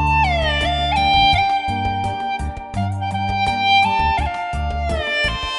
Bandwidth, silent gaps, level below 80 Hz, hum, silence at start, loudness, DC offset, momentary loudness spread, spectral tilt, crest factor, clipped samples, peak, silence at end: 11.5 kHz; none; -28 dBFS; none; 0 s; -18 LUFS; under 0.1%; 10 LU; -5 dB/octave; 14 dB; under 0.1%; -4 dBFS; 0 s